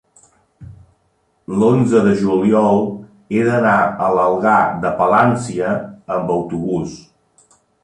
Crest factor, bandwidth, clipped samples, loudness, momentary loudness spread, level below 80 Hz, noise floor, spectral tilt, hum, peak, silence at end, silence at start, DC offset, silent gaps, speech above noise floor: 16 dB; 10.5 kHz; under 0.1%; -16 LUFS; 10 LU; -50 dBFS; -62 dBFS; -7.5 dB/octave; none; -2 dBFS; 0.85 s; 0.6 s; under 0.1%; none; 47 dB